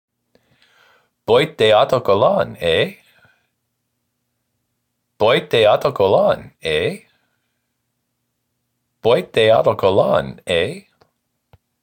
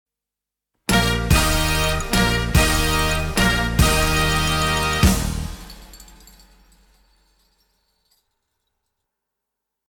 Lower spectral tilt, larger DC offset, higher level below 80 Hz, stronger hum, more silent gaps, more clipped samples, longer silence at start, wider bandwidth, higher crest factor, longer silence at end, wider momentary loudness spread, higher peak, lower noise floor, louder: first, -5.5 dB/octave vs -4 dB/octave; neither; second, -52 dBFS vs -28 dBFS; neither; neither; neither; first, 1.3 s vs 0.9 s; second, 17 kHz vs 19 kHz; about the same, 16 dB vs 16 dB; second, 1 s vs 3.85 s; about the same, 9 LU vs 10 LU; first, -2 dBFS vs -6 dBFS; second, -73 dBFS vs -86 dBFS; first, -16 LUFS vs -19 LUFS